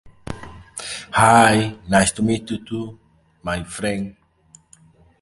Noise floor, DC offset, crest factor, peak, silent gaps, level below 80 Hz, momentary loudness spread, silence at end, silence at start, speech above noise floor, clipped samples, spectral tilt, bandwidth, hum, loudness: -53 dBFS; under 0.1%; 22 dB; 0 dBFS; none; -46 dBFS; 22 LU; 1.1 s; 0.05 s; 35 dB; under 0.1%; -4.5 dB/octave; 12 kHz; none; -19 LUFS